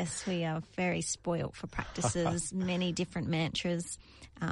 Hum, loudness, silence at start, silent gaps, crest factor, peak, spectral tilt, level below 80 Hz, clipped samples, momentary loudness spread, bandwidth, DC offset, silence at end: none; -34 LUFS; 0 s; none; 16 dB; -18 dBFS; -4.5 dB/octave; -54 dBFS; under 0.1%; 8 LU; 11.5 kHz; under 0.1%; 0 s